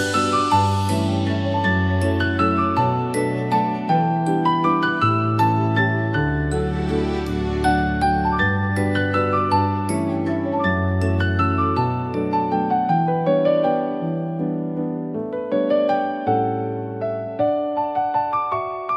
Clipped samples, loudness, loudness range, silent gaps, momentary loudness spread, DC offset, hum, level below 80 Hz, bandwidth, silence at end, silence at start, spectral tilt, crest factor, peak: under 0.1%; -21 LUFS; 3 LU; none; 6 LU; under 0.1%; none; -40 dBFS; 12.5 kHz; 0 s; 0 s; -7 dB/octave; 14 dB; -6 dBFS